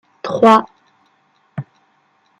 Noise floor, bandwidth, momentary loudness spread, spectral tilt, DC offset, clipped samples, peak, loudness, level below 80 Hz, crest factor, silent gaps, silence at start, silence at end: -59 dBFS; 11.5 kHz; 22 LU; -6 dB/octave; under 0.1%; under 0.1%; -2 dBFS; -13 LUFS; -66 dBFS; 18 dB; none; 0.25 s; 0.8 s